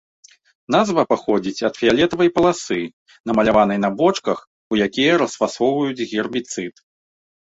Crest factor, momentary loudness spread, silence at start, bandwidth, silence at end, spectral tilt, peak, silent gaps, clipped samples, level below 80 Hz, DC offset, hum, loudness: 18 dB; 9 LU; 0.7 s; 8 kHz; 0.7 s; -5 dB/octave; -2 dBFS; 2.93-3.06 s, 3.20-3.24 s, 4.47-4.71 s; under 0.1%; -52 dBFS; under 0.1%; none; -19 LUFS